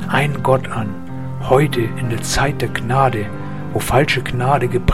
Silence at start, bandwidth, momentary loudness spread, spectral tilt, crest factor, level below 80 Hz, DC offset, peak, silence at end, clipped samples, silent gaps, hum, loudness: 0 s; 16 kHz; 11 LU; -5.5 dB/octave; 18 dB; -32 dBFS; 3%; 0 dBFS; 0 s; under 0.1%; none; none; -18 LUFS